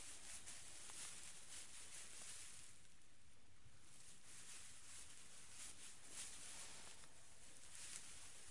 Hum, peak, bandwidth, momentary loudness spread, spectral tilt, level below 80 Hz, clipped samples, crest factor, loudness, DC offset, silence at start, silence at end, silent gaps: none; -32 dBFS; 12 kHz; 10 LU; 0 dB/octave; -78 dBFS; under 0.1%; 26 dB; -56 LUFS; 0.2%; 0 s; 0 s; none